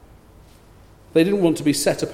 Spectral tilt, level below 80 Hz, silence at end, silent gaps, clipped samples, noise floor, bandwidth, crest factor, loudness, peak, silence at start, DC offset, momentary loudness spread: -5 dB/octave; -52 dBFS; 0 s; none; under 0.1%; -48 dBFS; 16 kHz; 18 dB; -19 LUFS; -4 dBFS; 1.15 s; under 0.1%; 3 LU